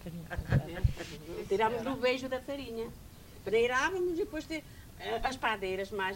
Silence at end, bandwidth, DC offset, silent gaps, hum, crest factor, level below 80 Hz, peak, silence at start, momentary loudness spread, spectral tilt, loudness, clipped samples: 0 s; 16 kHz; under 0.1%; none; none; 18 dB; -46 dBFS; -14 dBFS; 0 s; 13 LU; -5.5 dB/octave; -33 LUFS; under 0.1%